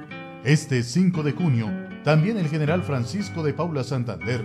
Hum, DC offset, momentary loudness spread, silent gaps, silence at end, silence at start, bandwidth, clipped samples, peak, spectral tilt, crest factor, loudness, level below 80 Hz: none; under 0.1%; 7 LU; none; 0 s; 0 s; 11.5 kHz; under 0.1%; -8 dBFS; -6.5 dB/octave; 16 dB; -24 LUFS; -52 dBFS